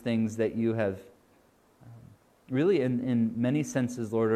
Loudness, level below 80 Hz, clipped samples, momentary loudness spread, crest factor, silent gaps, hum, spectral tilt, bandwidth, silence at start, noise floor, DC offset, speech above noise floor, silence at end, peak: -29 LUFS; -68 dBFS; under 0.1%; 6 LU; 14 dB; none; none; -7 dB/octave; 13.5 kHz; 0 s; -63 dBFS; under 0.1%; 36 dB; 0 s; -14 dBFS